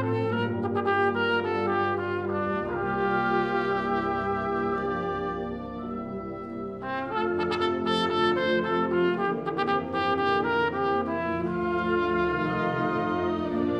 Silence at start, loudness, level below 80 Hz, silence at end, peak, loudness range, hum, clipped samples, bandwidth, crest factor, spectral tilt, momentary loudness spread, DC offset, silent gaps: 0 s; -27 LUFS; -54 dBFS; 0 s; -12 dBFS; 5 LU; none; under 0.1%; 9 kHz; 16 dB; -7 dB/octave; 8 LU; under 0.1%; none